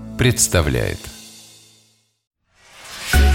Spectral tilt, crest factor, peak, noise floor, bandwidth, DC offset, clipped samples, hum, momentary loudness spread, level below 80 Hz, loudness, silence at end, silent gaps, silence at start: -4 dB/octave; 18 dB; -2 dBFS; -59 dBFS; 17 kHz; under 0.1%; under 0.1%; none; 24 LU; -24 dBFS; -18 LUFS; 0 s; 2.27-2.31 s; 0 s